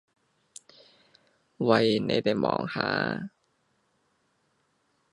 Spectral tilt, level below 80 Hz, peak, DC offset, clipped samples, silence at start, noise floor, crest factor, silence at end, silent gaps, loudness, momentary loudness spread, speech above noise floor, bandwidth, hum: -6 dB/octave; -66 dBFS; -6 dBFS; under 0.1%; under 0.1%; 1.6 s; -72 dBFS; 24 dB; 1.85 s; none; -26 LUFS; 9 LU; 46 dB; 11.5 kHz; none